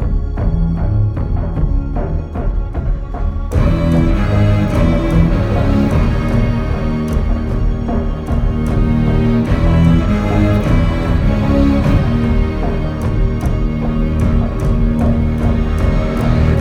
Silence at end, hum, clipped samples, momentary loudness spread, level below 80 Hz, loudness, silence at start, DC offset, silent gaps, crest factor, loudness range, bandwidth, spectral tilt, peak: 0 s; none; under 0.1%; 6 LU; -18 dBFS; -16 LUFS; 0 s; under 0.1%; none; 12 dB; 4 LU; 9.8 kHz; -8.5 dB/octave; 0 dBFS